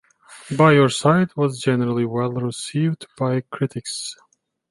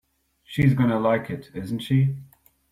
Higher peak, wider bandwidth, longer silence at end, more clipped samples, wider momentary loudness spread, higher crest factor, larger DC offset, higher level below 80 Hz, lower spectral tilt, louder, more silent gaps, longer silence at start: first, -2 dBFS vs -8 dBFS; second, 11.5 kHz vs 14 kHz; first, 0.6 s vs 0.45 s; neither; about the same, 13 LU vs 13 LU; about the same, 18 dB vs 16 dB; neither; second, -62 dBFS vs -52 dBFS; second, -6 dB/octave vs -8.5 dB/octave; first, -20 LUFS vs -23 LUFS; neither; second, 0.3 s vs 0.5 s